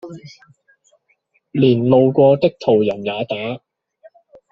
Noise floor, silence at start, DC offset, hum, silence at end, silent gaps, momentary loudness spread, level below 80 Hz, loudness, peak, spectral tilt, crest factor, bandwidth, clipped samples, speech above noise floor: -64 dBFS; 0.05 s; under 0.1%; none; 0.95 s; none; 17 LU; -60 dBFS; -16 LUFS; -2 dBFS; -6.5 dB/octave; 16 dB; 7 kHz; under 0.1%; 48 dB